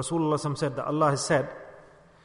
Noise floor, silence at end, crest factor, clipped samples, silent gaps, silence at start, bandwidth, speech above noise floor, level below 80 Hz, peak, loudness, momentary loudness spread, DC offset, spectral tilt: -53 dBFS; 0.45 s; 16 dB; under 0.1%; none; 0 s; 11 kHz; 26 dB; -60 dBFS; -12 dBFS; -27 LUFS; 9 LU; under 0.1%; -5.5 dB/octave